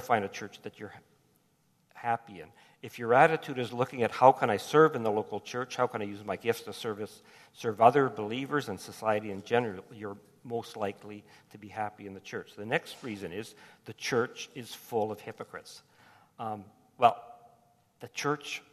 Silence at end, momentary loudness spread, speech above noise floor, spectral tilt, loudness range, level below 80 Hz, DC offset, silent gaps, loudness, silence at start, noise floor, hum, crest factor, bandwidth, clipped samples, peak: 0.15 s; 23 LU; 39 dB; -5 dB/octave; 11 LU; -76 dBFS; under 0.1%; none; -30 LUFS; 0 s; -70 dBFS; none; 26 dB; 14 kHz; under 0.1%; -6 dBFS